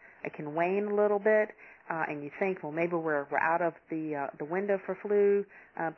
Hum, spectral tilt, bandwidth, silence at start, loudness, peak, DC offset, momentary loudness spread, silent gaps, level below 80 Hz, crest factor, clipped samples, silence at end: none; -9.5 dB/octave; 5.8 kHz; 0.25 s; -30 LUFS; -14 dBFS; under 0.1%; 10 LU; none; -80 dBFS; 16 dB; under 0.1%; 0.05 s